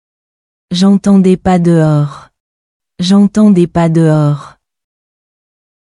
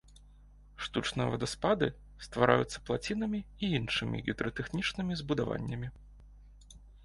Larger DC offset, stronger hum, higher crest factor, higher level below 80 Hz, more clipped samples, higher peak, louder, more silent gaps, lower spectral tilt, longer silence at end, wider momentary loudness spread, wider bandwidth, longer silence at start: neither; second, none vs 50 Hz at -50 dBFS; second, 12 dB vs 26 dB; first, -42 dBFS vs -52 dBFS; neither; first, 0 dBFS vs -8 dBFS; first, -10 LUFS vs -33 LUFS; first, 2.40-2.80 s vs none; first, -7.5 dB/octave vs -5.5 dB/octave; first, 1.35 s vs 0 s; about the same, 10 LU vs 10 LU; about the same, 11 kHz vs 11.5 kHz; first, 0.7 s vs 0.1 s